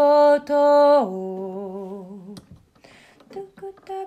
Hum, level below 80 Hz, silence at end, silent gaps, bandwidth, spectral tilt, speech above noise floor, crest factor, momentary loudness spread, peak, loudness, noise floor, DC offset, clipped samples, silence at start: none; -66 dBFS; 0 s; none; 8.6 kHz; -6.5 dB/octave; 32 dB; 14 dB; 24 LU; -8 dBFS; -18 LUFS; -52 dBFS; under 0.1%; under 0.1%; 0 s